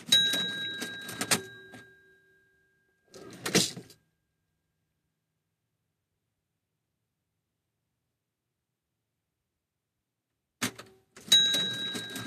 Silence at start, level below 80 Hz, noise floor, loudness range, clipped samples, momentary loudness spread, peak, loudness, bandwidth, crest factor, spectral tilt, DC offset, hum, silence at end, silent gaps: 0 s; -76 dBFS; -85 dBFS; 15 LU; under 0.1%; 17 LU; -8 dBFS; -27 LUFS; 14.5 kHz; 26 dB; -1 dB/octave; under 0.1%; none; 0 s; none